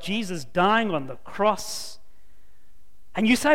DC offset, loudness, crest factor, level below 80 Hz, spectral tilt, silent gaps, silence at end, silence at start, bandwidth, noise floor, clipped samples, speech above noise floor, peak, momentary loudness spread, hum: 2%; -25 LUFS; 18 dB; -54 dBFS; -4 dB/octave; none; 0 s; 0 s; 16.5 kHz; -59 dBFS; under 0.1%; 36 dB; -6 dBFS; 14 LU; none